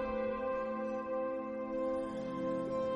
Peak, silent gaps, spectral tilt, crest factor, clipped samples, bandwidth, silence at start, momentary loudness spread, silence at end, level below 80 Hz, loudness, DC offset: -26 dBFS; none; -7.5 dB/octave; 12 dB; under 0.1%; 9.2 kHz; 0 s; 3 LU; 0 s; -60 dBFS; -37 LUFS; under 0.1%